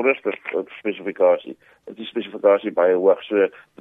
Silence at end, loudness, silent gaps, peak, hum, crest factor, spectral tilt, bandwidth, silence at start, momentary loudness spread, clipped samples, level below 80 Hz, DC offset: 0.3 s; -21 LUFS; none; -4 dBFS; none; 18 dB; -7.5 dB/octave; 3.9 kHz; 0 s; 12 LU; under 0.1%; -74 dBFS; under 0.1%